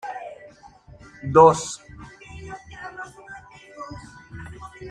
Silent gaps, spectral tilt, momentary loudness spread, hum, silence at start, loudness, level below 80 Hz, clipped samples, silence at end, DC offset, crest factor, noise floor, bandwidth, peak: none; -5.5 dB/octave; 27 LU; none; 0.05 s; -18 LUFS; -52 dBFS; under 0.1%; 0 s; under 0.1%; 24 dB; -48 dBFS; 10.5 kHz; -2 dBFS